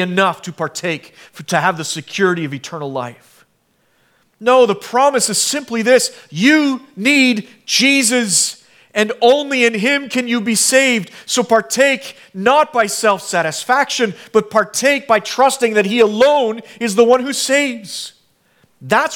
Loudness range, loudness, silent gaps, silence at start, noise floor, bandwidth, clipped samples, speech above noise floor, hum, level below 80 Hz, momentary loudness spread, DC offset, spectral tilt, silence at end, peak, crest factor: 5 LU; -15 LUFS; none; 0 s; -61 dBFS; 18 kHz; under 0.1%; 46 dB; none; -66 dBFS; 11 LU; under 0.1%; -2.5 dB/octave; 0 s; 0 dBFS; 16 dB